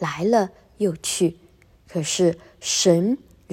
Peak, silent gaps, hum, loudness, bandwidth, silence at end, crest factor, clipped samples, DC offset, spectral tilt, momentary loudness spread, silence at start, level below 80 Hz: -4 dBFS; none; none; -22 LUFS; 16 kHz; 0 s; 18 dB; under 0.1%; under 0.1%; -4 dB/octave; 12 LU; 0 s; -58 dBFS